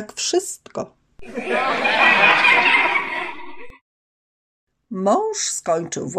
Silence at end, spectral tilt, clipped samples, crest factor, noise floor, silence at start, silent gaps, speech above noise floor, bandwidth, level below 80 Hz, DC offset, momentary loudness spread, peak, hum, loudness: 0 s; -2 dB/octave; under 0.1%; 18 dB; under -90 dBFS; 0 s; 3.81-4.67 s; over 68 dB; 15.5 kHz; -60 dBFS; under 0.1%; 20 LU; -2 dBFS; none; -17 LUFS